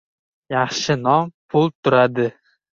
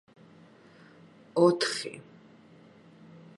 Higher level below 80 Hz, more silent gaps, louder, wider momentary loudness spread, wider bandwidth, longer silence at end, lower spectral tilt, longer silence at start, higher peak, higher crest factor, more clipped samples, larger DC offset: first, -58 dBFS vs -82 dBFS; first, 1.34-1.49 s, 1.75-1.83 s vs none; first, -19 LUFS vs -27 LUFS; second, 8 LU vs 18 LU; second, 7.6 kHz vs 11.5 kHz; second, 0.5 s vs 1.4 s; about the same, -5.5 dB/octave vs -4.5 dB/octave; second, 0.5 s vs 1.35 s; first, -2 dBFS vs -10 dBFS; second, 18 dB vs 24 dB; neither; neither